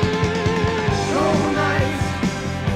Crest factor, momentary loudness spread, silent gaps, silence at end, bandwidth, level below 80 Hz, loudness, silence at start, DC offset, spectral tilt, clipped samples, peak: 12 dB; 4 LU; none; 0 s; 14 kHz; -36 dBFS; -20 LUFS; 0 s; under 0.1%; -5.5 dB/octave; under 0.1%; -6 dBFS